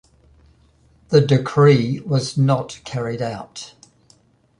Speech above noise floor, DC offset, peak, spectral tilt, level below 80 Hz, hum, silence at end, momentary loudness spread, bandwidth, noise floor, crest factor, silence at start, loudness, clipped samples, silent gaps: 38 dB; under 0.1%; -2 dBFS; -7 dB/octave; -54 dBFS; none; 0.95 s; 18 LU; 10.5 kHz; -56 dBFS; 18 dB; 1.1 s; -18 LUFS; under 0.1%; none